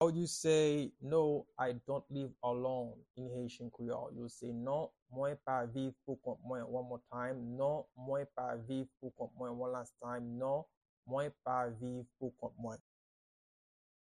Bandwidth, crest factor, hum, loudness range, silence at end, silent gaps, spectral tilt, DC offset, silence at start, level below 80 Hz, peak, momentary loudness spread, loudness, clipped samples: 10.5 kHz; 20 dB; none; 5 LU; 1.35 s; 3.10-3.14 s, 5.02-5.06 s, 10.77-10.81 s, 10.89-11.03 s; -5.5 dB/octave; under 0.1%; 0 s; -74 dBFS; -20 dBFS; 12 LU; -40 LUFS; under 0.1%